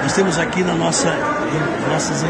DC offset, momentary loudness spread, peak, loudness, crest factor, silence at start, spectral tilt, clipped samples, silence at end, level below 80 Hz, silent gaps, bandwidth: under 0.1%; 3 LU; -4 dBFS; -18 LUFS; 14 dB; 0 s; -4 dB/octave; under 0.1%; 0 s; -46 dBFS; none; 10.5 kHz